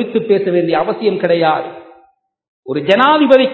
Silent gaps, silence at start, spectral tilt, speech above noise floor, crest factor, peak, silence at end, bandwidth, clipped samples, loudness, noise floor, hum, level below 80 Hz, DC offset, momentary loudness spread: 2.48-2.63 s; 0 s; -7.5 dB/octave; 40 dB; 14 dB; 0 dBFS; 0 s; 8 kHz; 0.1%; -13 LUFS; -53 dBFS; none; -60 dBFS; under 0.1%; 11 LU